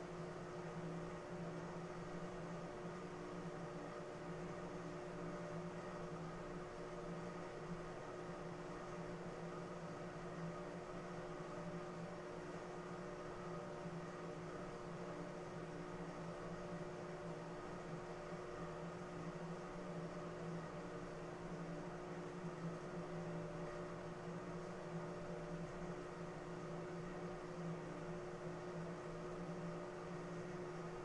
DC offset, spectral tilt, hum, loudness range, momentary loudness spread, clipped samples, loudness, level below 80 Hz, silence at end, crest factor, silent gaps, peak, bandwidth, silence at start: under 0.1%; -6.5 dB/octave; none; 1 LU; 2 LU; under 0.1%; -50 LUFS; -64 dBFS; 0 s; 14 dB; none; -36 dBFS; 11 kHz; 0 s